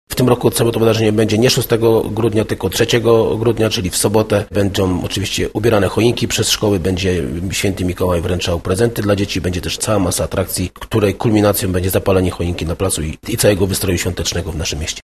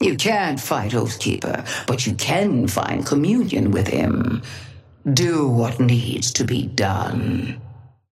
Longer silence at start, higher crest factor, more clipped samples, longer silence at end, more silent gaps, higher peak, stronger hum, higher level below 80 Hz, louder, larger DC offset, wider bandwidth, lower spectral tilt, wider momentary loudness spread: about the same, 0.1 s vs 0 s; about the same, 16 dB vs 18 dB; neither; second, 0.05 s vs 0.3 s; neither; first, 0 dBFS vs -4 dBFS; neither; first, -34 dBFS vs -50 dBFS; first, -16 LUFS vs -20 LUFS; first, 0.4% vs under 0.1%; second, 13.5 kHz vs 15.5 kHz; about the same, -5 dB/octave vs -5 dB/octave; about the same, 6 LU vs 7 LU